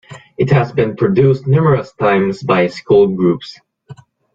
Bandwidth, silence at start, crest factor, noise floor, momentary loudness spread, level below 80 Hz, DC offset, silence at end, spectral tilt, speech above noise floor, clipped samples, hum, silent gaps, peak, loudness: 7.6 kHz; 0.1 s; 14 dB; -39 dBFS; 7 LU; -48 dBFS; under 0.1%; 0.4 s; -8.5 dB/octave; 26 dB; under 0.1%; none; none; 0 dBFS; -14 LUFS